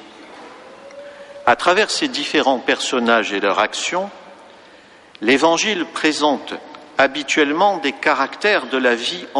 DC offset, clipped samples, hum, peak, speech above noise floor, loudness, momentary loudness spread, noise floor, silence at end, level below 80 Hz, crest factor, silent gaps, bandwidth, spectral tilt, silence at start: under 0.1%; under 0.1%; none; -2 dBFS; 28 dB; -17 LUFS; 19 LU; -45 dBFS; 0 s; -62 dBFS; 16 dB; none; 11.5 kHz; -2.5 dB/octave; 0 s